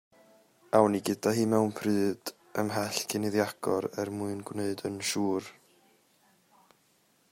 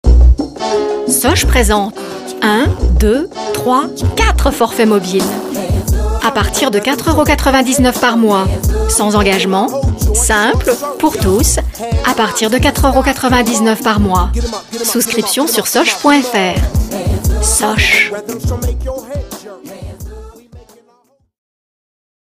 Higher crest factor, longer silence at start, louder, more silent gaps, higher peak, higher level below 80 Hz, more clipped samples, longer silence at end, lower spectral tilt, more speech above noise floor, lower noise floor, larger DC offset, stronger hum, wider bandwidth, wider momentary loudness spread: first, 24 dB vs 12 dB; first, 0.75 s vs 0.05 s; second, -30 LUFS vs -13 LUFS; neither; second, -8 dBFS vs 0 dBFS; second, -72 dBFS vs -18 dBFS; neither; about the same, 1.8 s vs 1.75 s; about the same, -5 dB/octave vs -4 dB/octave; about the same, 39 dB vs 42 dB; first, -68 dBFS vs -54 dBFS; neither; neither; about the same, 16 kHz vs 15.5 kHz; about the same, 10 LU vs 9 LU